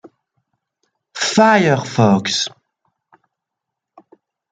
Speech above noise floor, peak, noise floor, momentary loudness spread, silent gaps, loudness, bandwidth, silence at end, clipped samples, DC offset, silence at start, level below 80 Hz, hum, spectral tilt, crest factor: 68 dB; -2 dBFS; -81 dBFS; 11 LU; none; -15 LUFS; 9.4 kHz; 2.05 s; under 0.1%; under 0.1%; 1.15 s; -62 dBFS; none; -4.5 dB/octave; 18 dB